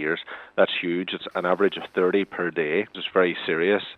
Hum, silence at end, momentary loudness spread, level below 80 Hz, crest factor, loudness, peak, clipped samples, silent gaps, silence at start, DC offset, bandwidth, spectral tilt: none; 0 s; 6 LU; -72 dBFS; 20 dB; -24 LUFS; -6 dBFS; under 0.1%; none; 0 s; under 0.1%; 5.4 kHz; -7 dB/octave